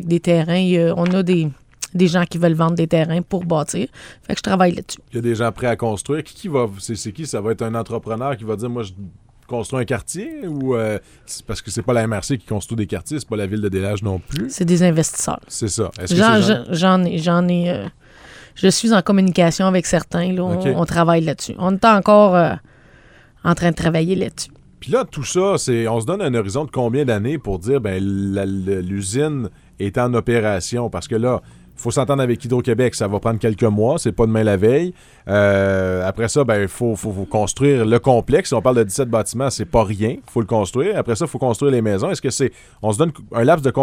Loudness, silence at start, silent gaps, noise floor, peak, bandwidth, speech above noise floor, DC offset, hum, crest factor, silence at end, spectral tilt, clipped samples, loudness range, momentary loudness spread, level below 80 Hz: -18 LUFS; 0 s; none; -47 dBFS; -2 dBFS; 16 kHz; 30 dB; under 0.1%; none; 16 dB; 0 s; -5.5 dB/octave; under 0.1%; 6 LU; 10 LU; -44 dBFS